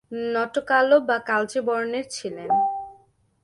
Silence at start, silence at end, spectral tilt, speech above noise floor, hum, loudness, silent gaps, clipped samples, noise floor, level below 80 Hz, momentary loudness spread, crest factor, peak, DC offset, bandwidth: 0.1 s; 0.5 s; -3.5 dB/octave; 35 dB; none; -23 LUFS; none; under 0.1%; -58 dBFS; -68 dBFS; 14 LU; 18 dB; -6 dBFS; under 0.1%; 11.5 kHz